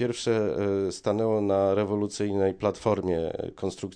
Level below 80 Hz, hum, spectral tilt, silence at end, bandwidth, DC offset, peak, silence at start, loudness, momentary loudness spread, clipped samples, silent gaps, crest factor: -56 dBFS; none; -6 dB/octave; 0 s; 10.5 kHz; under 0.1%; -10 dBFS; 0 s; -27 LUFS; 7 LU; under 0.1%; none; 16 dB